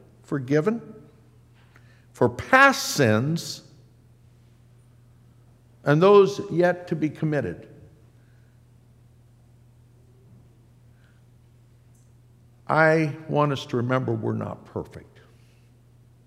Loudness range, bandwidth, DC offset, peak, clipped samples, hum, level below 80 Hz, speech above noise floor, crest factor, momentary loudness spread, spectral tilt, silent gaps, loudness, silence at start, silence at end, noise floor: 6 LU; 16 kHz; under 0.1%; -2 dBFS; under 0.1%; none; -64 dBFS; 33 dB; 24 dB; 18 LU; -5.5 dB/octave; none; -22 LUFS; 0.3 s; 1.25 s; -55 dBFS